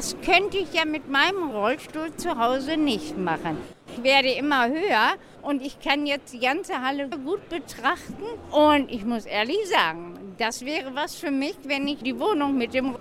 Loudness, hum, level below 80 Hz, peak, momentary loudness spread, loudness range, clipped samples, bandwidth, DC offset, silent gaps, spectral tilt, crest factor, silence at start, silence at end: -24 LUFS; none; -54 dBFS; -6 dBFS; 10 LU; 3 LU; under 0.1%; 15.5 kHz; under 0.1%; none; -3.5 dB/octave; 20 dB; 0 s; 0 s